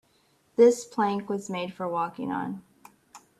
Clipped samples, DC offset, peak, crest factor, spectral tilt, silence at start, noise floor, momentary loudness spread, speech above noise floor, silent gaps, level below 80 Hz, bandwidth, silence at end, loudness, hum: under 0.1%; under 0.1%; -8 dBFS; 20 dB; -5.5 dB/octave; 0.6 s; -66 dBFS; 14 LU; 40 dB; none; -72 dBFS; 13 kHz; 0.2 s; -27 LUFS; none